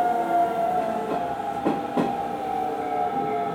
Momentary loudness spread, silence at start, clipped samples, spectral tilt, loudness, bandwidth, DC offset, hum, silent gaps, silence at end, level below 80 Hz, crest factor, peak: 5 LU; 0 s; under 0.1%; -6.5 dB/octave; -26 LUFS; 17.5 kHz; under 0.1%; none; none; 0 s; -58 dBFS; 16 dB; -8 dBFS